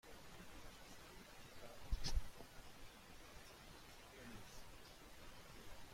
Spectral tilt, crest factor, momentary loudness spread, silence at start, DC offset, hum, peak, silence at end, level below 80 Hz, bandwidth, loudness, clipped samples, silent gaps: -3.5 dB/octave; 24 dB; 12 LU; 0.05 s; under 0.1%; none; -26 dBFS; 0 s; -52 dBFS; 16.5 kHz; -56 LUFS; under 0.1%; none